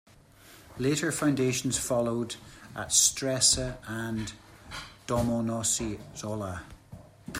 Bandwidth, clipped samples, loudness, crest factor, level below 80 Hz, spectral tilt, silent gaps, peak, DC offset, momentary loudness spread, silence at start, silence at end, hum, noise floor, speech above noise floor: 16 kHz; under 0.1%; -27 LUFS; 24 dB; -52 dBFS; -3 dB/octave; none; -8 dBFS; under 0.1%; 19 LU; 0.45 s; 0 s; none; -54 dBFS; 26 dB